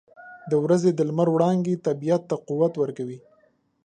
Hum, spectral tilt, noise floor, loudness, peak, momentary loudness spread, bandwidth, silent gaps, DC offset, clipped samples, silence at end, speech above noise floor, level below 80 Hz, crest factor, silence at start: none; -8 dB/octave; -63 dBFS; -23 LUFS; -6 dBFS; 14 LU; 9.6 kHz; none; under 0.1%; under 0.1%; 0.65 s; 40 dB; -72 dBFS; 18 dB; 0.2 s